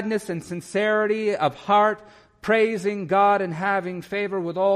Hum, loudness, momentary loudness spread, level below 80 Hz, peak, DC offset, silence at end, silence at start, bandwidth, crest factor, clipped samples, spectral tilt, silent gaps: none; -23 LUFS; 10 LU; -64 dBFS; -8 dBFS; under 0.1%; 0 s; 0 s; 13 kHz; 14 dB; under 0.1%; -5.5 dB/octave; none